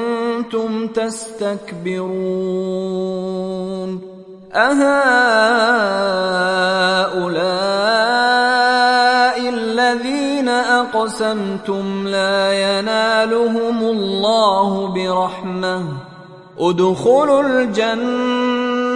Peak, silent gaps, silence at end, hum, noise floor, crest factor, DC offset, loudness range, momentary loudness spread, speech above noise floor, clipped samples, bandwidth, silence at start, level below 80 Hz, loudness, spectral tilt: 0 dBFS; none; 0 s; none; -38 dBFS; 16 dB; under 0.1%; 7 LU; 10 LU; 22 dB; under 0.1%; 11.5 kHz; 0 s; -56 dBFS; -16 LUFS; -4.5 dB/octave